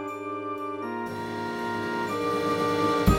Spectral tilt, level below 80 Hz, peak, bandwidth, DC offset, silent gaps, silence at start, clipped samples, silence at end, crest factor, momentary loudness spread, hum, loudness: -6 dB/octave; -40 dBFS; -8 dBFS; 17 kHz; under 0.1%; none; 0 s; under 0.1%; 0 s; 20 dB; 8 LU; none; -29 LUFS